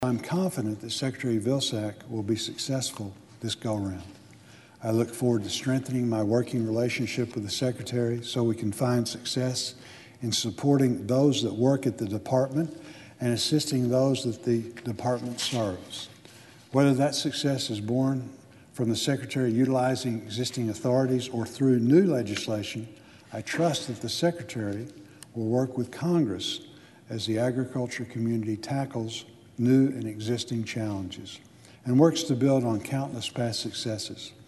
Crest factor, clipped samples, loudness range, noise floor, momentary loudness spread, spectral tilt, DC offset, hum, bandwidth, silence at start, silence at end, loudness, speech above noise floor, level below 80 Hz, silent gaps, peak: 20 dB; under 0.1%; 4 LU; -52 dBFS; 13 LU; -5.5 dB/octave; under 0.1%; none; 12.5 kHz; 0 s; 0.05 s; -28 LUFS; 25 dB; -66 dBFS; none; -6 dBFS